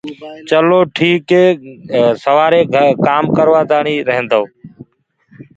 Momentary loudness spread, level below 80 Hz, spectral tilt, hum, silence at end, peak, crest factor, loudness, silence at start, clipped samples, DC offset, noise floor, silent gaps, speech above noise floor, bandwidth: 8 LU; -56 dBFS; -7 dB/octave; none; 0.15 s; 0 dBFS; 12 dB; -12 LUFS; 0.05 s; under 0.1%; under 0.1%; -56 dBFS; none; 43 dB; 7.8 kHz